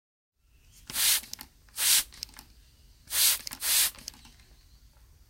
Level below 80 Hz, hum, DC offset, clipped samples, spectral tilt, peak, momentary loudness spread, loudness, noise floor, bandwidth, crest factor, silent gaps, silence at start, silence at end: -58 dBFS; none; under 0.1%; under 0.1%; 2.5 dB/octave; -8 dBFS; 20 LU; -25 LUFS; -59 dBFS; 17 kHz; 24 dB; none; 0.9 s; 1.4 s